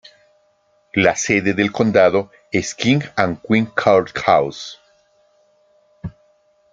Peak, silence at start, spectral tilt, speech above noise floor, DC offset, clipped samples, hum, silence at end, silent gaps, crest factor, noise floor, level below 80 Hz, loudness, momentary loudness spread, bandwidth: 0 dBFS; 0.95 s; -5 dB/octave; 43 dB; under 0.1%; under 0.1%; none; 0.65 s; none; 18 dB; -60 dBFS; -54 dBFS; -17 LUFS; 19 LU; 9.4 kHz